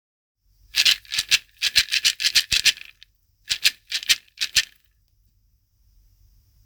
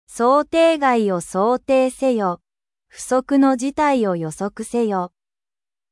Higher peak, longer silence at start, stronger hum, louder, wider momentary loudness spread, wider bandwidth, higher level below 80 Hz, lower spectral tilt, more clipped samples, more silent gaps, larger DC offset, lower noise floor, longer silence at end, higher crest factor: about the same, -2 dBFS vs -4 dBFS; first, 0.75 s vs 0.1 s; neither; about the same, -20 LUFS vs -19 LUFS; about the same, 9 LU vs 10 LU; first, over 20 kHz vs 12 kHz; about the same, -54 dBFS vs -56 dBFS; second, 3 dB/octave vs -5.5 dB/octave; neither; neither; neither; second, -64 dBFS vs under -90 dBFS; first, 2 s vs 0.85 s; first, 24 dB vs 16 dB